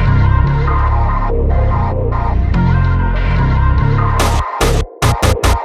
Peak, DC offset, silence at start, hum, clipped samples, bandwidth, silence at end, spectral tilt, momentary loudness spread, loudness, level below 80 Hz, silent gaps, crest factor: 0 dBFS; under 0.1%; 0 s; none; under 0.1%; 14 kHz; 0 s; -6 dB/octave; 3 LU; -14 LUFS; -16 dBFS; none; 10 dB